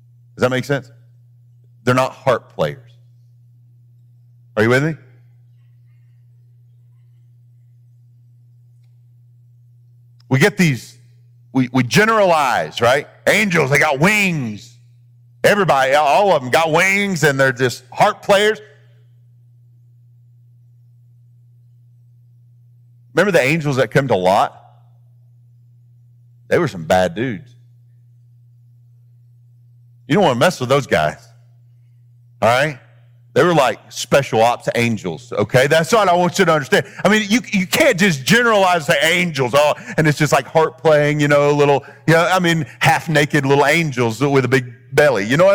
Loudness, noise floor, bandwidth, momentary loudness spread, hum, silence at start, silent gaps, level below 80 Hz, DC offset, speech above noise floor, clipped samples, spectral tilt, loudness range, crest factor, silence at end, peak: -15 LUFS; -48 dBFS; over 20 kHz; 8 LU; none; 0.4 s; none; -54 dBFS; under 0.1%; 33 dB; under 0.1%; -5 dB/octave; 9 LU; 16 dB; 0 s; -2 dBFS